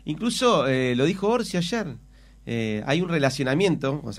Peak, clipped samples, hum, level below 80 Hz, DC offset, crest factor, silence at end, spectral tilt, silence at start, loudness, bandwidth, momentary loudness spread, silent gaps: -8 dBFS; under 0.1%; none; -52 dBFS; under 0.1%; 16 dB; 0 s; -5.5 dB/octave; 0.05 s; -24 LUFS; 15 kHz; 10 LU; none